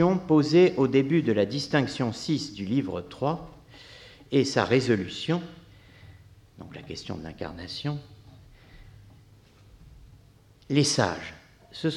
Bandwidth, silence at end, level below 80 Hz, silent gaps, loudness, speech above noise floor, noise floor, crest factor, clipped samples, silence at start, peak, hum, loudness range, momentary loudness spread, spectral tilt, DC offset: 12 kHz; 0 s; -56 dBFS; none; -26 LUFS; 31 dB; -56 dBFS; 20 dB; under 0.1%; 0 s; -8 dBFS; none; 14 LU; 23 LU; -5.5 dB/octave; under 0.1%